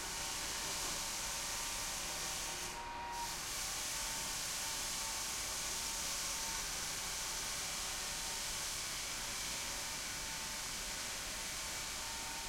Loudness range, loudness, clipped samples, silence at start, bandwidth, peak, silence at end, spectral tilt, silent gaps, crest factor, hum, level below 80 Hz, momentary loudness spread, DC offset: 2 LU; -39 LUFS; under 0.1%; 0 s; 16.5 kHz; -28 dBFS; 0 s; 0 dB/octave; none; 14 dB; none; -56 dBFS; 3 LU; under 0.1%